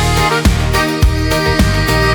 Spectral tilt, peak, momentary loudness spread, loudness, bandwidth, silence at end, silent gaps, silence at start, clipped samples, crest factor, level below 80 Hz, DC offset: -5 dB/octave; -2 dBFS; 2 LU; -13 LUFS; over 20 kHz; 0 s; none; 0 s; under 0.1%; 10 dB; -18 dBFS; under 0.1%